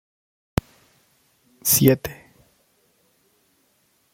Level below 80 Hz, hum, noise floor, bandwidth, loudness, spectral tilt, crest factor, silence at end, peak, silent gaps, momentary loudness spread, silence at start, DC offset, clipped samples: -48 dBFS; none; -65 dBFS; 16.5 kHz; -20 LUFS; -4.5 dB/octave; 26 dB; 2 s; 0 dBFS; none; 14 LU; 1.65 s; under 0.1%; under 0.1%